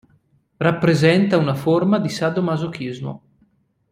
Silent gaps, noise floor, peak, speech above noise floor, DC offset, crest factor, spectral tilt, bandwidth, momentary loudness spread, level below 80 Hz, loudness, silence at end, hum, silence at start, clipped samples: none; -61 dBFS; -2 dBFS; 43 dB; under 0.1%; 18 dB; -7 dB/octave; 15.5 kHz; 14 LU; -58 dBFS; -19 LUFS; 0.75 s; none; 0.6 s; under 0.1%